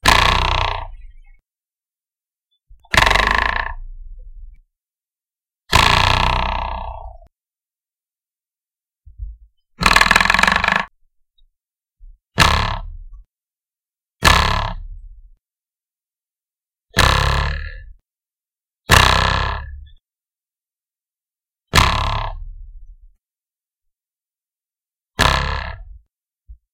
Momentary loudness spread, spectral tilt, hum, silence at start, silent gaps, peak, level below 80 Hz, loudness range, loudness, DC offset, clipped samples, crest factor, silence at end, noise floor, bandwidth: 24 LU; -3 dB/octave; none; 0.05 s; none; 0 dBFS; -28 dBFS; 7 LU; -15 LUFS; under 0.1%; under 0.1%; 20 dB; 0.2 s; under -90 dBFS; 17 kHz